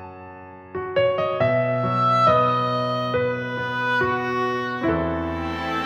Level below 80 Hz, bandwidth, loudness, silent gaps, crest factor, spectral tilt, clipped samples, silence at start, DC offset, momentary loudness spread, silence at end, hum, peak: -46 dBFS; 14 kHz; -22 LUFS; none; 16 dB; -7 dB/octave; under 0.1%; 0 s; under 0.1%; 13 LU; 0 s; none; -6 dBFS